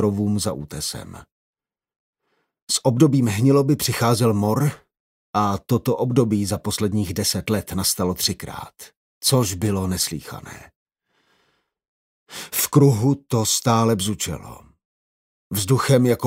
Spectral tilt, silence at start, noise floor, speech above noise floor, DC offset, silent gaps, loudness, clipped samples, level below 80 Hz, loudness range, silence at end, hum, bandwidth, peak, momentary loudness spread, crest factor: -5 dB/octave; 0 s; -68 dBFS; 48 dB; under 0.1%; 1.32-1.53 s, 1.96-2.13 s, 2.62-2.67 s, 5.00-5.33 s, 8.96-9.21 s, 10.76-10.86 s, 11.88-12.26 s, 14.85-15.50 s; -20 LUFS; under 0.1%; -52 dBFS; 5 LU; 0 s; none; 16 kHz; -2 dBFS; 15 LU; 18 dB